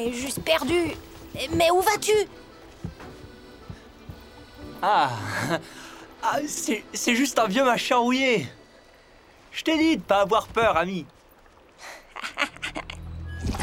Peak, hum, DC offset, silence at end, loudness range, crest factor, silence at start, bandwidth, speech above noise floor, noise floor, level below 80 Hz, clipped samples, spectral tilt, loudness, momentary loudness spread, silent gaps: -6 dBFS; none; under 0.1%; 0 s; 6 LU; 20 dB; 0 s; 17 kHz; 30 dB; -54 dBFS; -48 dBFS; under 0.1%; -3.5 dB/octave; -24 LUFS; 22 LU; none